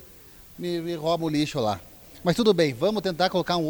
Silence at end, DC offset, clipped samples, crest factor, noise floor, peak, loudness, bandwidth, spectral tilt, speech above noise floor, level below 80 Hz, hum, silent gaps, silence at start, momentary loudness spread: 0 s; under 0.1%; under 0.1%; 18 dB; -49 dBFS; -8 dBFS; -25 LUFS; over 20 kHz; -5.5 dB/octave; 24 dB; -54 dBFS; none; none; 0 s; 10 LU